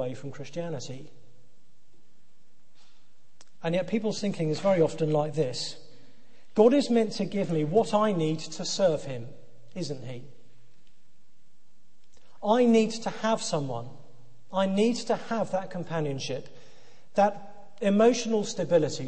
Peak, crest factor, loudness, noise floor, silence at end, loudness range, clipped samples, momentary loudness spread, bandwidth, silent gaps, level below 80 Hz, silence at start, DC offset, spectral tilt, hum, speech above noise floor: -8 dBFS; 20 dB; -27 LUFS; -70 dBFS; 0 s; 12 LU; under 0.1%; 16 LU; 8.8 kHz; none; -68 dBFS; 0 s; 1%; -5.5 dB/octave; none; 43 dB